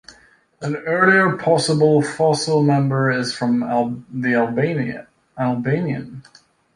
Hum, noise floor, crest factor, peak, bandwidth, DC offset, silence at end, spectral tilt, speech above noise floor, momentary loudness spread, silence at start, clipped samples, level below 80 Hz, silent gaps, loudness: none; -52 dBFS; 18 dB; -2 dBFS; 11.5 kHz; under 0.1%; 0.55 s; -6 dB/octave; 34 dB; 11 LU; 0.1 s; under 0.1%; -60 dBFS; none; -19 LUFS